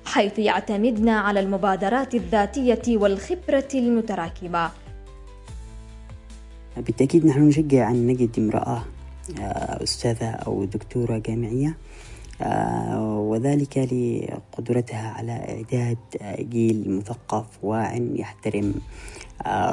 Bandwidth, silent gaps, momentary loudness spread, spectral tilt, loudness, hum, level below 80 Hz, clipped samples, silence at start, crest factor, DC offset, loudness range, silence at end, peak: 11.5 kHz; none; 20 LU; -6.5 dB/octave; -23 LUFS; none; -44 dBFS; under 0.1%; 0 s; 18 dB; under 0.1%; 6 LU; 0 s; -6 dBFS